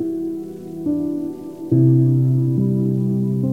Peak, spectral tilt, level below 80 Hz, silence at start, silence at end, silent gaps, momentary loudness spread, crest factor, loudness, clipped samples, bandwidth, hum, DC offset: -4 dBFS; -11.5 dB/octave; -60 dBFS; 0 s; 0 s; none; 14 LU; 14 dB; -19 LUFS; under 0.1%; 1.4 kHz; none; 0.3%